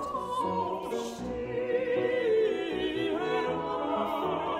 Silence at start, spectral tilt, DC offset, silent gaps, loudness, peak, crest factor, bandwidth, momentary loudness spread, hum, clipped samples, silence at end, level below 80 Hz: 0 s; -5.5 dB/octave; under 0.1%; none; -30 LUFS; -18 dBFS; 12 dB; 15.5 kHz; 7 LU; none; under 0.1%; 0 s; -58 dBFS